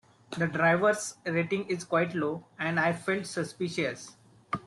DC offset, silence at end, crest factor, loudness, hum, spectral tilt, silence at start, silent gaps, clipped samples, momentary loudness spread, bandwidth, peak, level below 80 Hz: under 0.1%; 0.05 s; 18 dB; -29 LUFS; none; -5 dB/octave; 0.3 s; none; under 0.1%; 10 LU; 12.5 kHz; -12 dBFS; -68 dBFS